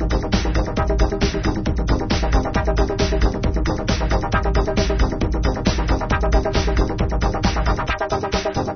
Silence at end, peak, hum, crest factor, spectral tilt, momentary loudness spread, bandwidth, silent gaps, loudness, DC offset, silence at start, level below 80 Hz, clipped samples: 0 s; -2 dBFS; none; 16 dB; -6 dB/octave; 2 LU; 6.6 kHz; none; -21 LUFS; under 0.1%; 0 s; -22 dBFS; under 0.1%